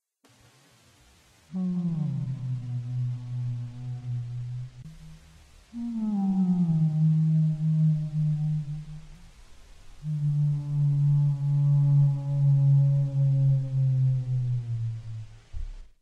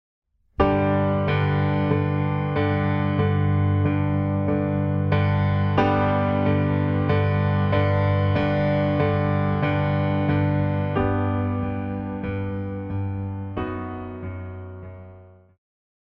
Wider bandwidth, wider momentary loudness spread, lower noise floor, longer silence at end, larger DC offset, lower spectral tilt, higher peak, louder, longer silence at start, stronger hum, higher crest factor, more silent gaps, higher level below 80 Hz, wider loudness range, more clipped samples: second, 3.8 kHz vs 5.4 kHz; first, 18 LU vs 9 LU; first, -60 dBFS vs -47 dBFS; second, 0.15 s vs 0.8 s; neither; about the same, -10.5 dB/octave vs -10 dB/octave; second, -14 dBFS vs -4 dBFS; second, -26 LUFS vs -23 LUFS; first, 1.5 s vs 0.6 s; neither; second, 12 dB vs 18 dB; neither; about the same, -48 dBFS vs -44 dBFS; about the same, 10 LU vs 9 LU; neither